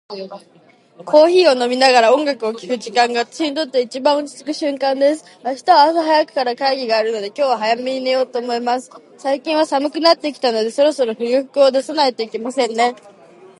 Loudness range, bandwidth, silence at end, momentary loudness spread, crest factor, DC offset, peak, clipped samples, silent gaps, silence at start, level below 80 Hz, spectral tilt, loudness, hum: 4 LU; 11.5 kHz; 0.65 s; 11 LU; 16 dB; under 0.1%; 0 dBFS; under 0.1%; none; 0.1 s; -76 dBFS; -3 dB/octave; -16 LUFS; none